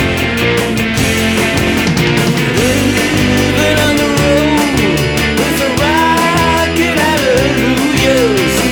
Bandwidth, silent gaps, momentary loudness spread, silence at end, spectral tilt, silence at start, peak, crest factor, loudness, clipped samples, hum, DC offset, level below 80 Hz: over 20 kHz; none; 2 LU; 0 s; -4.5 dB/octave; 0 s; 0 dBFS; 10 dB; -11 LUFS; under 0.1%; none; under 0.1%; -28 dBFS